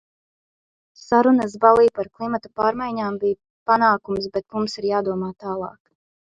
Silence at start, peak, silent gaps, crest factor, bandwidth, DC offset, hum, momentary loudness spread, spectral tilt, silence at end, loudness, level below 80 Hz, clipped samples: 1.1 s; 0 dBFS; 3.50-3.66 s; 20 dB; 9.2 kHz; under 0.1%; none; 12 LU; -6 dB/octave; 0.7 s; -21 LUFS; -58 dBFS; under 0.1%